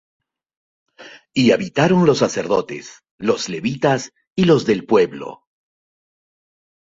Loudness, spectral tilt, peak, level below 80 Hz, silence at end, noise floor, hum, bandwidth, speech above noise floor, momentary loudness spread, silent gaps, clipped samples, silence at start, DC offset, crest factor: -18 LUFS; -5.5 dB/octave; -2 dBFS; -56 dBFS; 1.5 s; -40 dBFS; none; 8 kHz; 23 dB; 13 LU; 3.11-3.18 s, 4.27-4.36 s; under 0.1%; 1 s; under 0.1%; 18 dB